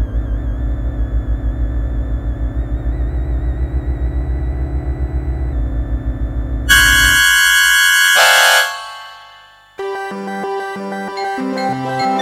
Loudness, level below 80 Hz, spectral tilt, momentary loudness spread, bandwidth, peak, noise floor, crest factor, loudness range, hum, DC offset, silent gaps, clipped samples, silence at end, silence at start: -15 LUFS; -20 dBFS; -2.5 dB/octave; 15 LU; 17 kHz; 0 dBFS; -43 dBFS; 16 dB; 11 LU; 50 Hz at -45 dBFS; under 0.1%; none; under 0.1%; 0 s; 0 s